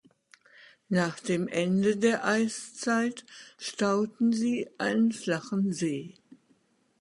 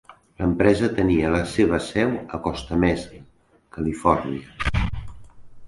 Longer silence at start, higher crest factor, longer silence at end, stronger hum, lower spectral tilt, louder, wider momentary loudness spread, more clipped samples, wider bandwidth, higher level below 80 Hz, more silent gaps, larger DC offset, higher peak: first, 0.9 s vs 0.1 s; about the same, 18 dB vs 22 dB; first, 0.9 s vs 0 s; neither; about the same, -5.5 dB/octave vs -6.5 dB/octave; second, -28 LUFS vs -23 LUFS; about the same, 10 LU vs 11 LU; neither; about the same, 11.5 kHz vs 11.5 kHz; second, -72 dBFS vs -36 dBFS; neither; neither; second, -12 dBFS vs -2 dBFS